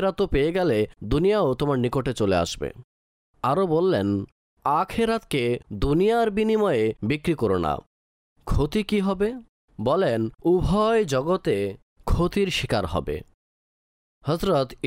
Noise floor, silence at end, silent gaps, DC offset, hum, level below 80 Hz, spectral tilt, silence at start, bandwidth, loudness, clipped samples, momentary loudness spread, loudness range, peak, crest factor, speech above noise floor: under -90 dBFS; 0 s; 2.84-3.34 s, 4.32-4.57 s, 7.86-8.36 s, 9.49-9.68 s, 11.82-11.96 s, 13.34-14.21 s; under 0.1%; none; -38 dBFS; -6.5 dB/octave; 0 s; 16 kHz; -24 LUFS; under 0.1%; 8 LU; 3 LU; -12 dBFS; 12 dB; over 67 dB